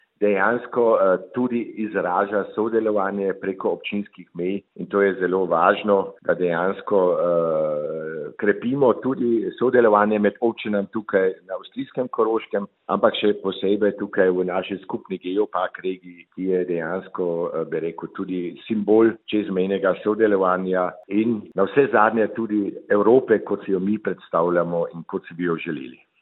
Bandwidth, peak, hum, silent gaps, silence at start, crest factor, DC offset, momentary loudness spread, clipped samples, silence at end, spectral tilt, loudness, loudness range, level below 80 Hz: 4.1 kHz; -2 dBFS; none; none; 0.2 s; 20 dB; under 0.1%; 11 LU; under 0.1%; 0.3 s; -10.5 dB/octave; -22 LUFS; 4 LU; -68 dBFS